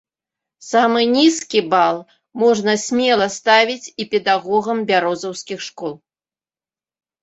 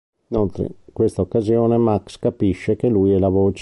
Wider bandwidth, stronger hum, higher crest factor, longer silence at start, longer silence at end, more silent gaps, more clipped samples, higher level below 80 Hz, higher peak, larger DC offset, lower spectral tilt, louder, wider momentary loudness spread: second, 8.2 kHz vs 11.5 kHz; neither; about the same, 16 dB vs 12 dB; first, 0.6 s vs 0.3 s; first, 1.25 s vs 0 s; neither; neither; second, -64 dBFS vs -40 dBFS; first, -2 dBFS vs -6 dBFS; neither; second, -3 dB/octave vs -9 dB/octave; about the same, -17 LUFS vs -19 LUFS; first, 14 LU vs 8 LU